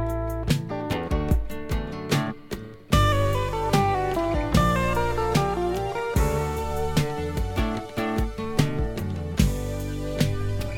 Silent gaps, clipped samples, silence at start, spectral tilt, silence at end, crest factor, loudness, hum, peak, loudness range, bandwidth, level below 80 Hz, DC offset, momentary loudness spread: none; under 0.1%; 0 s; -6 dB/octave; 0 s; 20 dB; -26 LUFS; none; -4 dBFS; 4 LU; 18 kHz; -32 dBFS; under 0.1%; 8 LU